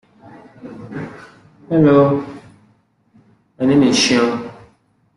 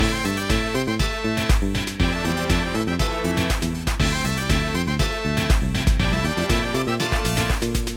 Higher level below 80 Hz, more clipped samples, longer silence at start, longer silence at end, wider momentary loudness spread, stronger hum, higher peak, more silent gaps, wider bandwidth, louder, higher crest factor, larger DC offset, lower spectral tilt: second, -54 dBFS vs -26 dBFS; neither; first, 0.65 s vs 0 s; first, 0.65 s vs 0 s; first, 23 LU vs 2 LU; neither; first, -2 dBFS vs -6 dBFS; neither; second, 11.5 kHz vs 17 kHz; first, -15 LUFS vs -22 LUFS; about the same, 16 dB vs 16 dB; neither; about the same, -5 dB/octave vs -4.5 dB/octave